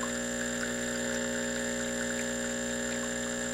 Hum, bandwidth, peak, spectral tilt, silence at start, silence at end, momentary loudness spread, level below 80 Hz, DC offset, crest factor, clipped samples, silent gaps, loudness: 60 Hz at -40 dBFS; 16 kHz; -20 dBFS; -2.5 dB/octave; 0 s; 0 s; 1 LU; -54 dBFS; under 0.1%; 14 dB; under 0.1%; none; -32 LUFS